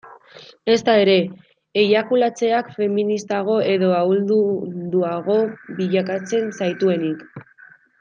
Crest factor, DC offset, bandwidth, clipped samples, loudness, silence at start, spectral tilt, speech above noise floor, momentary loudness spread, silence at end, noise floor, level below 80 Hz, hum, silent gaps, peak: 16 dB; under 0.1%; 7.6 kHz; under 0.1%; -19 LUFS; 0.05 s; -6 dB/octave; 30 dB; 9 LU; 0.6 s; -49 dBFS; -68 dBFS; none; none; -4 dBFS